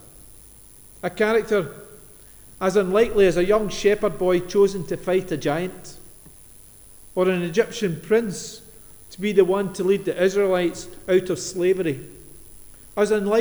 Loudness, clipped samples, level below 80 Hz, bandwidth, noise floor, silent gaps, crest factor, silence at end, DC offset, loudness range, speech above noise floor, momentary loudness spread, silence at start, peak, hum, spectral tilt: -22 LUFS; under 0.1%; -46 dBFS; over 20 kHz; -47 dBFS; none; 18 dB; 0 s; under 0.1%; 5 LU; 26 dB; 14 LU; 0.3 s; -4 dBFS; none; -5.5 dB/octave